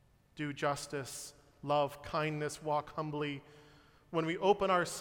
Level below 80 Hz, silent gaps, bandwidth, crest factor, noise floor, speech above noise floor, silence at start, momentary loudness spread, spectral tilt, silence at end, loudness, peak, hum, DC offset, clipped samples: -66 dBFS; none; 17 kHz; 22 dB; -62 dBFS; 27 dB; 0.35 s; 13 LU; -4.5 dB/octave; 0 s; -35 LUFS; -14 dBFS; none; under 0.1%; under 0.1%